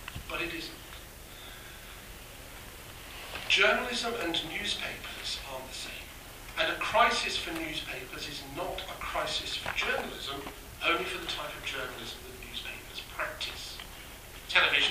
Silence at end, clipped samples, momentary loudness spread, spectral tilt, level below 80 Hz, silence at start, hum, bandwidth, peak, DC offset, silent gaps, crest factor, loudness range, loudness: 0 s; under 0.1%; 20 LU; -2 dB/octave; -52 dBFS; 0 s; none; 15.5 kHz; -8 dBFS; under 0.1%; none; 26 dB; 5 LU; -31 LUFS